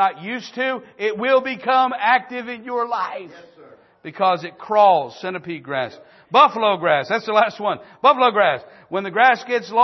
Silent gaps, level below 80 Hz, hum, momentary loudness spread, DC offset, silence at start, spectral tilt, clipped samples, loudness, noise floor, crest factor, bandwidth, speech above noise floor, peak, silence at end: none; -74 dBFS; none; 14 LU; under 0.1%; 0 s; -5 dB/octave; under 0.1%; -19 LUFS; -48 dBFS; 18 dB; 6.2 kHz; 29 dB; -2 dBFS; 0 s